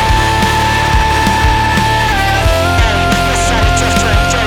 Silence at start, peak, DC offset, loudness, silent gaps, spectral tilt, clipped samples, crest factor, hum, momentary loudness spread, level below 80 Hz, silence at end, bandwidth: 0 s; 0 dBFS; under 0.1%; -11 LUFS; none; -4 dB/octave; under 0.1%; 10 dB; none; 1 LU; -18 dBFS; 0 s; 18.5 kHz